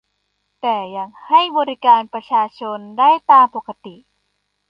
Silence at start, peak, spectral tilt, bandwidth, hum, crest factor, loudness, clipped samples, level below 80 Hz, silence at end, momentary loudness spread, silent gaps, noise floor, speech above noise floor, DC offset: 0.65 s; -2 dBFS; -5.5 dB/octave; 5.4 kHz; 50 Hz at -65 dBFS; 16 dB; -15 LUFS; under 0.1%; -72 dBFS; 0.8 s; 17 LU; none; -70 dBFS; 54 dB; under 0.1%